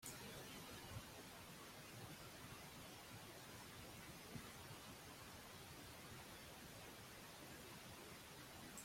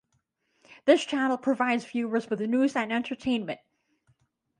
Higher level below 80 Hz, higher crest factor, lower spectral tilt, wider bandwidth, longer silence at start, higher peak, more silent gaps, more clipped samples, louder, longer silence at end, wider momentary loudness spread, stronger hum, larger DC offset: about the same, -74 dBFS vs -70 dBFS; about the same, 20 dB vs 22 dB; second, -3 dB/octave vs -4.5 dB/octave; first, 16.5 kHz vs 10.5 kHz; second, 0 s vs 0.7 s; second, -38 dBFS vs -6 dBFS; neither; neither; second, -56 LUFS vs -27 LUFS; second, 0 s vs 1.05 s; second, 2 LU vs 7 LU; neither; neither